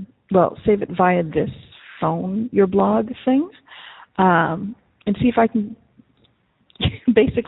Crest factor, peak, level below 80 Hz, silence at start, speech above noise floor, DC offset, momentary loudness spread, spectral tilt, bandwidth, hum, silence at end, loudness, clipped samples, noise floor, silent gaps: 18 dB; -2 dBFS; -46 dBFS; 0 s; 42 dB; under 0.1%; 15 LU; -12 dB/octave; 4.1 kHz; none; 0.05 s; -19 LUFS; under 0.1%; -61 dBFS; none